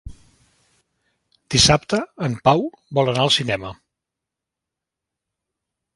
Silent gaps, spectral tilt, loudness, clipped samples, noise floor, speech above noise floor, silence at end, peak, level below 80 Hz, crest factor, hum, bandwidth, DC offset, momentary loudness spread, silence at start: none; -3.5 dB/octave; -18 LUFS; under 0.1%; -85 dBFS; 66 dB; 2.2 s; 0 dBFS; -44 dBFS; 22 dB; none; 11.5 kHz; under 0.1%; 12 LU; 0.05 s